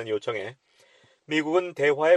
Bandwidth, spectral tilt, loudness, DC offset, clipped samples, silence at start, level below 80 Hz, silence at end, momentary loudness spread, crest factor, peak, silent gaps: 10.5 kHz; -5 dB/octave; -26 LUFS; under 0.1%; under 0.1%; 0 s; -74 dBFS; 0 s; 10 LU; 18 dB; -8 dBFS; none